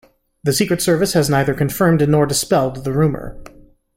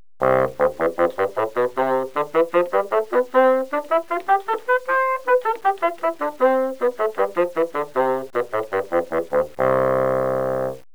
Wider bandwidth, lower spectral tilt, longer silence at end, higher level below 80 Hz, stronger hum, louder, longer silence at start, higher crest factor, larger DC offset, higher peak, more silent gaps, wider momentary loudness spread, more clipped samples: second, 16.5 kHz vs over 20 kHz; second, -5 dB/octave vs -6.5 dB/octave; first, 0.5 s vs 0.15 s; first, -42 dBFS vs -56 dBFS; neither; first, -17 LUFS vs -21 LUFS; first, 0.45 s vs 0.2 s; about the same, 14 dB vs 18 dB; second, under 0.1% vs 0.8%; about the same, -2 dBFS vs -4 dBFS; neither; about the same, 6 LU vs 4 LU; neither